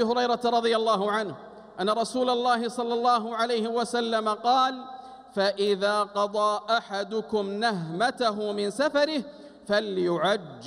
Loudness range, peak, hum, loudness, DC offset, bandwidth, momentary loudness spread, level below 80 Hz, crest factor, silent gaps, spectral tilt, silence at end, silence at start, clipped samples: 2 LU; -12 dBFS; none; -26 LUFS; under 0.1%; 14 kHz; 7 LU; -70 dBFS; 14 dB; none; -4.5 dB/octave; 0 s; 0 s; under 0.1%